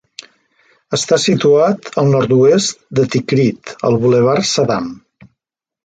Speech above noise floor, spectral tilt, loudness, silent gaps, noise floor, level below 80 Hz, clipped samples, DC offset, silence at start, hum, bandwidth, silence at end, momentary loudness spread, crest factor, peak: 65 dB; -5 dB/octave; -14 LUFS; none; -79 dBFS; -52 dBFS; under 0.1%; under 0.1%; 0.9 s; none; 9.4 kHz; 0.9 s; 8 LU; 14 dB; 0 dBFS